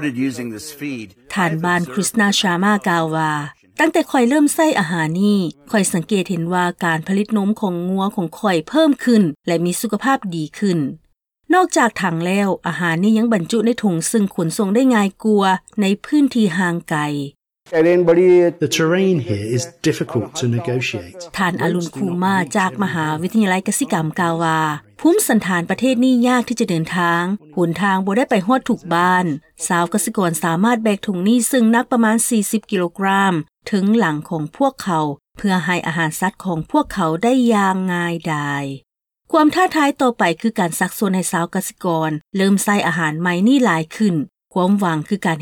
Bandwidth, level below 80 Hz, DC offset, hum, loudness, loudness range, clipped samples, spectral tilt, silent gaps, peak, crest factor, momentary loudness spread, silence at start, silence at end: 19 kHz; -56 dBFS; under 0.1%; none; -17 LUFS; 3 LU; under 0.1%; -5 dB/octave; none; -4 dBFS; 12 dB; 7 LU; 0 s; 0 s